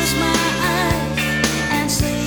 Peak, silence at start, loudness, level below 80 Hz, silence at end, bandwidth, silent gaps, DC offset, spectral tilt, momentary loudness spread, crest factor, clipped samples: -2 dBFS; 0 s; -18 LUFS; -32 dBFS; 0 s; over 20 kHz; none; 0.3%; -3.5 dB/octave; 2 LU; 16 dB; under 0.1%